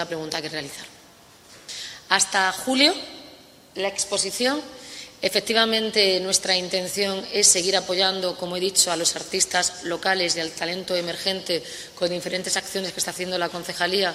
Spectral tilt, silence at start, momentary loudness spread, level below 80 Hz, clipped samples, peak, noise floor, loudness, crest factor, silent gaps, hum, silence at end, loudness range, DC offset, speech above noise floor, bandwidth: -1 dB/octave; 0 s; 15 LU; -62 dBFS; under 0.1%; -2 dBFS; -50 dBFS; -22 LUFS; 22 dB; none; none; 0 s; 5 LU; under 0.1%; 27 dB; 16 kHz